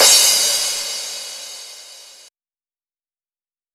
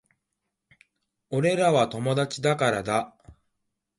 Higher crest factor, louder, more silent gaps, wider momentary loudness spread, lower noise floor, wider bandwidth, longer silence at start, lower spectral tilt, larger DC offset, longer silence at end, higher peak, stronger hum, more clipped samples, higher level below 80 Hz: about the same, 20 dB vs 18 dB; first, -14 LUFS vs -25 LUFS; neither; first, 24 LU vs 7 LU; first, under -90 dBFS vs -82 dBFS; first, 20 kHz vs 11.5 kHz; second, 0 s vs 1.3 s; second, 3 dB/octave vs -5.5 dB/octave; neither; first, 1.7 s vs 0.65 s; first, 0 dBFS vs -10 dBFS; neither; neither; second, -68 dBFS vs -62 dBFS